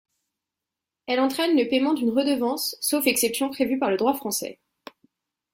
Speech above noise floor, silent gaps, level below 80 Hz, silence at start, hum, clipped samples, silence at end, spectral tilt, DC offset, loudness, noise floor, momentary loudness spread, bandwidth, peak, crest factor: 64 dB; none; -68 dBFS; 1.1 s; none; under 0.1%; 1 s; -2.5 dB/octave; under 0.1%; -23 LUFS; -87 dBFS; 7 LU; 16.5 kHz; -8 dBFS; 18 dB